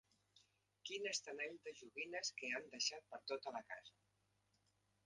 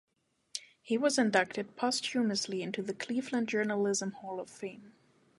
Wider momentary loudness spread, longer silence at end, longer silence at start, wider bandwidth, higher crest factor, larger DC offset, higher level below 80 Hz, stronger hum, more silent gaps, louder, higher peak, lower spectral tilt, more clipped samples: second, 12 LU vs 15 LU; first, 1.15 s vs 0.5 s; second, 0.35 s vs 0.55 s; about the same, 11 kHz vs 11.5 kHz; about the same, 24 dB vs 22 dB; neither; second, under -90 dBFS vs -80 dBFS; neither; neither; second, -47 LUFS vs -32 LUFS; second, -28 dBFS vs -12 dBFS; second, 0 dB/octave vs -3.5 dB/octave; neither